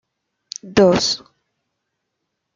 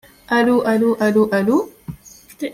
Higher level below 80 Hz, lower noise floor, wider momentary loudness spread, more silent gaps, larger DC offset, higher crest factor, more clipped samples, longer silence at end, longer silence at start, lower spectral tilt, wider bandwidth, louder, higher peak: about the same, -52 dBFS vs -54 dBFS; first, -77 dBFS vs -42 dBFS; first, 20 LU vs 16 LU; neither; neither; first, 20 dB vs 12 dB; neither; first, 1.4 s vs 0 s; first, 0.65 s vs 0.3 s; second, -4 dB/octave vs -6 dB/octave; second, 9.2 kHz vs 15.5 kHz; about the same, -17 LUFS vs -17 LUFS; about the same, -2 dBFS vs -4 dBFS